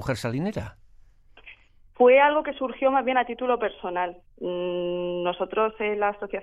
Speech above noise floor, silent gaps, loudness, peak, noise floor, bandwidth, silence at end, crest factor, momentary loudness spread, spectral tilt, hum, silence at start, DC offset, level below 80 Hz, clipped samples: 29 dB; none; -24 LUFS; -8 dBFS; -53 dBFS; 12 kHz; 0 s; 18 dB; 13 LU; -6 dB/octave; none; 0 s; under 0.1%; -54 dBFS; under 0.1%